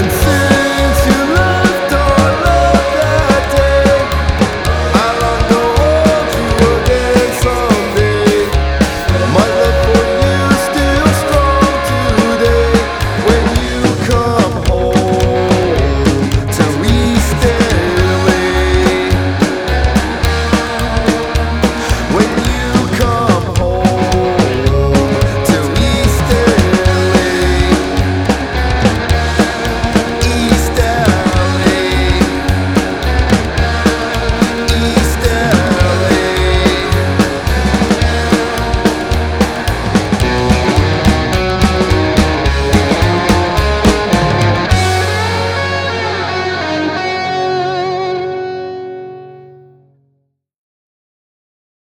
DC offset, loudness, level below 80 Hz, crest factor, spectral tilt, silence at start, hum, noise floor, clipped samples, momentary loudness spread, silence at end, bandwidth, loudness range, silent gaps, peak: under 0.1%; -12 LUFS; -20 dBFS; 12 dB; -5.5 dB/octave; 0 s; none; -63 dBFS; under 0.1%; 4 LU; 2.35 s; 19.5 kHz; 3 LU; none; 0 dBFS